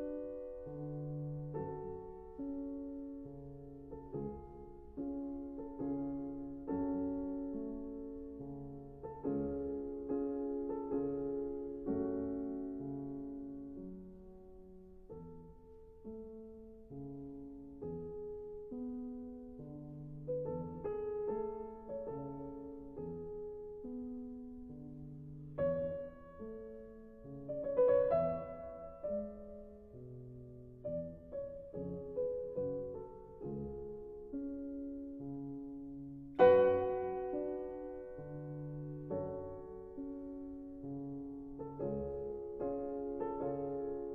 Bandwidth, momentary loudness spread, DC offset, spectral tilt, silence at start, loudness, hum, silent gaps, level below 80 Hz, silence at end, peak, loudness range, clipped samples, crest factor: 4.3 kHz; 14 LU; under 0.1%; -8 dB/octave; 0 s; -41 LUFS; none; none; -60 dBFS; 0 s; -14 dBFS; 13 LU; under 0.1%; 28 dB